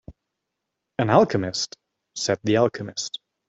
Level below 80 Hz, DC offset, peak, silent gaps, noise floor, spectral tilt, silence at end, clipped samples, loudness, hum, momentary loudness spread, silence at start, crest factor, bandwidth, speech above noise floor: -60 dBFS; under 0.1%; -2 dBFS; none; -82 dBFS; -4.5 dB/octave; 0.4 s; under 0.1%; -23 LUFS; none; 13 LU; 0.1 s; 22 dB; 8.2 kHz; 60 dB